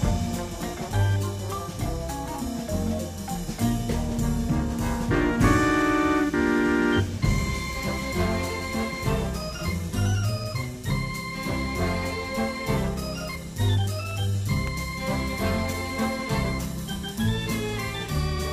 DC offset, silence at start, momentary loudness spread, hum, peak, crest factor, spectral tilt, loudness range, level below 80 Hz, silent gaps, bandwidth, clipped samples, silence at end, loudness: under 0.1%; 0 s; 9 LU; none; -6 dBFS; 20 dB; -5.5 dB/octave; 5 LU; -36 dBFS; none; 15.5 kHz; under 0.1%; 0 s; -27 LUFS